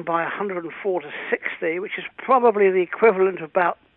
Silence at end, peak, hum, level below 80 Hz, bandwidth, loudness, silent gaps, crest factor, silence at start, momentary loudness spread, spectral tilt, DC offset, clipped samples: 0.25 s; -4 dBFS; none; -70 dBFS; 4.1 kHz; -21 LUFS; none; 16 dB; 0 s; 10 LU; -10 dB/octave; under 0.1%; under 0.1%